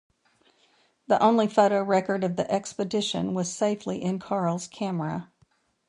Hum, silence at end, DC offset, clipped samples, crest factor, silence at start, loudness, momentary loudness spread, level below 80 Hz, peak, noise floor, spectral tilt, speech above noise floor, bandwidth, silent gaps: none; 0.65 s; under 0.1%; under 0.1%; 20 dB; 1.1 s; -26 LUFS; 10 LU; -66 dBFS; -6 dBFS; -66 dBFS; -5.5 dB/octave; 41 dB; 11 kHz; none